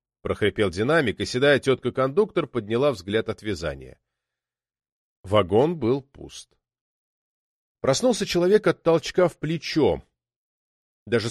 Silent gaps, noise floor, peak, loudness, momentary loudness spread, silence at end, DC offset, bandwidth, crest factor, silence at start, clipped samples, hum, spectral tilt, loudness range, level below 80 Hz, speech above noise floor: 4.92-5.24 s, 6.81-7.75 s, 10.36-11.06 s; -90 dBFS; -6 dBFS; -23 LUFS; 11 LU; 0 s; under 0.1%; 13 kHz; 18 dB; 0.25 s; under 0.1%; none; -5.5 dB/octave; 4 LU; -52 dBFS; 67 dB